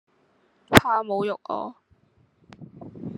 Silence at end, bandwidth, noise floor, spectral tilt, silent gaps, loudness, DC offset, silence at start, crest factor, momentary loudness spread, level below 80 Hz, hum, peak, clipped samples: 0 s; 12 kHz; -64 dBFS; -4.5 dB/octave; none; -22 LUFS; under 0.1%; 0.7 s; 26 dB; 23 LU; -48 dBFS; none; 0 dBFS; under 0.1%